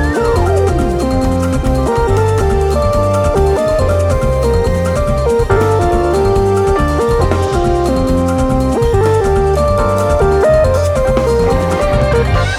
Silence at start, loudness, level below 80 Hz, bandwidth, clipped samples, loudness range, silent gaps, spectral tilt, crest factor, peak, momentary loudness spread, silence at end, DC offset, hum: 0 s; -13 LUFS; -20 dBFS; 15 kHz; under 0.1%; 1 LU; none; -7 dB/octave; 12 dB; 0 dBFS; 2 LU; 0 s; under 0.1%; none